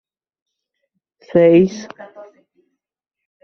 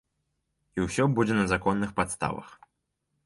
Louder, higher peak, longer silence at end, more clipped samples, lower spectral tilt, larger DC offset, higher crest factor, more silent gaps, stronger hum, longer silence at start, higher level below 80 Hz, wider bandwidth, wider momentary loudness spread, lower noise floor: first, -14 LUFS vs -27 LUFS; first, -2 dBFS vs -10 dBFS; first, 1.4 s vs 0.7 s; neither; first, -7.5 dB/octave vs -6 dB/octave; neither; about the same, 18 dB vs 18 dB; neither; neither; first, 1.35 s vs 0.75 s; second, -60 dBFS vs -52 dBFS; second, 6.4 kHz vs 11.5 kHz; first, 24 LU vs 9 LU; first, -83 dBFS vs -79 dBFS